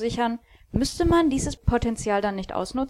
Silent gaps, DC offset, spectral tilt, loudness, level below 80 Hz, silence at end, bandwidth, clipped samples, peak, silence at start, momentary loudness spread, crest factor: none; under 0.1%; -5.5 dB/octave; -25 LUFS; -36 dBFS; 0 s; 13.5 kHz; under 0.1%; -8 dBFS; 0 s; 9 LU; 16 dB